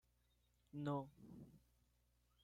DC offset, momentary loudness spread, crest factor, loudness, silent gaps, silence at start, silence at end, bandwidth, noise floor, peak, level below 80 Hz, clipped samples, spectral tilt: under 0.1%; 17 LU; 20 dB; -49 LUFS; none; 0.75 s; 0.85 s; 14.5 kHz; -80 dBFS; -34 dBFS; -78 dBFS; under 0.1%; -8.5 dB/octave